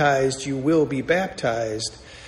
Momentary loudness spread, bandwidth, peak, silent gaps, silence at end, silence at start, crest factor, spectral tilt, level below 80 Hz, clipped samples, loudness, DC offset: 7 LU; 13 kHz; -6 dBFS; none; 0 s; 0 s; 16 dB; -5 dB/octave; -50 dBFS; under 0.1%; -23 LUFS; under 0.1%